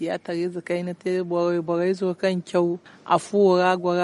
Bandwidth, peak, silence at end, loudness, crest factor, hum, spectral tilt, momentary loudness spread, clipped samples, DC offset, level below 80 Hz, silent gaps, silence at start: 11.5 kHz; -6 dBFS; 0 s; -23 LUFS; 18 dB; none; -6.5 dB/octave; 9 LU; under 0.1%; under 0.1%; -72 dBFS; none; 0 s